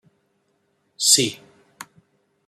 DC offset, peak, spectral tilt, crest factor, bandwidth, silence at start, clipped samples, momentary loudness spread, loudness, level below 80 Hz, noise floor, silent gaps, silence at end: under 0.1%; 0 dBFS; -1 dB/octave; 26 dB; 15.5 kHz; 1 s; under 0.1%; 27 LU; -17 LUFS; -72 dBFS; -68 dBFS; none; 1.1 s